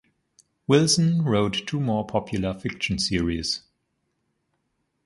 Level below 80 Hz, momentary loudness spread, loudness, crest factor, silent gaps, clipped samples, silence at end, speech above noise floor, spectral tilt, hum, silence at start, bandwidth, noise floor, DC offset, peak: -46 dBFS; 9 LU; -24 LUFS; 20 dB; none; under 0.1%; 1.5 s; 52 dB; -5 dB/octave; none; 0.7 s; 11.5 kHz; -75 dBFS; under 0.1%; -6 dBFS